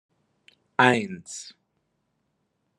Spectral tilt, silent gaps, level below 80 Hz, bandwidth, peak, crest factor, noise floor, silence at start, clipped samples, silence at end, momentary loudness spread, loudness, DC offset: -4.5 dB/octave; none; -76 dBFS; 11.5 kHz; -2 dBFS; 26 dB; -75 dBFS; 0.8 s; under 0.1%; 1.35 s; 19 LU; -23 LUFS; under 0.1%